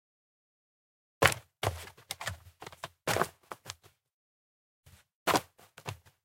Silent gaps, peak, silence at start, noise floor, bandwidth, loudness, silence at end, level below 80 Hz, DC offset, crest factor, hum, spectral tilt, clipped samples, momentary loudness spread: 4.13-4.83 s, 5.15-5.26 s; -2 dBFS; 1.2 s; -51 dBFS; 17 kHz; -32 LUFS; 0.3 s; -58 dBFS; under 0.1%; 36 dB; none; -3 dB/octave; under 0.1%; 20 LU